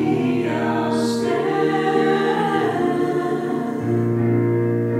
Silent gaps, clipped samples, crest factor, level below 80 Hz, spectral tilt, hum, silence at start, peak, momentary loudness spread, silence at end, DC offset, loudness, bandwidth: none; under 0.1%; 12 dB; -58 dBFS; -7 dB/octave; none; 0 s; -6 dBFS; 4 LU; 0 s; under 0.1%; -20 LUFS; 14 kHz